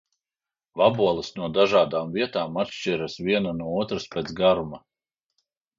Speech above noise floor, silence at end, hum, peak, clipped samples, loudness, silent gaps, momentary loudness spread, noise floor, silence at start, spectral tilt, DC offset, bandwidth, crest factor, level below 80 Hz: over 66 dB; 1 s; none; -6 dBFS; under 0.1%; -24 LUFS; none; 9 LU; under -90 dBFS; 0.75 s; -5.5 dB/octave; under 0.1%; 7.6 kHz; 20 dB; -56 dBFS